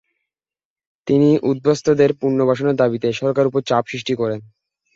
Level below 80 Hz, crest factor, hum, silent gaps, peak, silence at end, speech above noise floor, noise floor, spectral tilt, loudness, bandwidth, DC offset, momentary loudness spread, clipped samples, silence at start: -58 dBFS; 16 dB; none; none; -2 dBFS; 0.5 s; over 73 dB; under -90 dBFS; -7 dB/octave; -18 LUFS; 7.8 kHz; under 0.1%; 7 LU; under 0.1%; 1.05 s